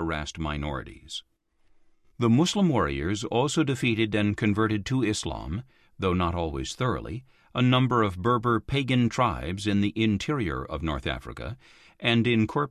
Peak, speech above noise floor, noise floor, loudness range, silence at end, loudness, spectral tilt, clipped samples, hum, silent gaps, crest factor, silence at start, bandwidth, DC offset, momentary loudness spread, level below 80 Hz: -10 dBFS; 35 dB; -61 dBFS; 3 LU; 0 s; -26 LUFS; -6 dB/octave; under 0.1%; none; none; 18 dB; 0 s; 13 kHz; under 0.1%; 14 LU; -42 dBFS